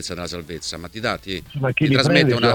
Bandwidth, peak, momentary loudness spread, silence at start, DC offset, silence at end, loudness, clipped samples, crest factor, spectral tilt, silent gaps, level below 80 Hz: 18.5 kHz; 0 dBFS; 14 LU; 0 s; under 0.1%; 0 s; -20 LUFS; under 0.1%; 20 dB; -5 dB/octave; none; -46 dBFS